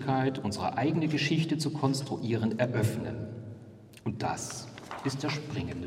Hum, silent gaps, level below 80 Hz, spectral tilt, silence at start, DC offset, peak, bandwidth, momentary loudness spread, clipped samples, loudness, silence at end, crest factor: none; none; -64 dBFS; -5.5 dB/octave; 0 s; under 0.1%; -12 dBFS; 16 kHz; 13 LU; under 0.1%; -31 LUFS; 0 s; 20 dB